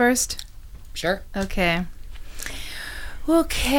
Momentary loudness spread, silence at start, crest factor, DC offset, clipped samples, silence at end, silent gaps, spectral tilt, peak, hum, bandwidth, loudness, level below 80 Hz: 16 LU; 0 s; 18 dB; under 0.1%; under 0.1%; 0 s; none; -3.5 dB/octave; -6 dBFS; none; 18 kHz; -25 LUFS; -34 dBFS